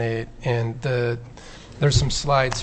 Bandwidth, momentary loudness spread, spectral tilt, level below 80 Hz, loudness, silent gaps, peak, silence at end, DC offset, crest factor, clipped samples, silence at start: 8.6 kHz; 19 LU; -5 dB/octave; -36 dBFS; -23 LUFS; none; -6 dBFS; 0 s; under 0.1%; 16 dB; under 0.1%; 0 s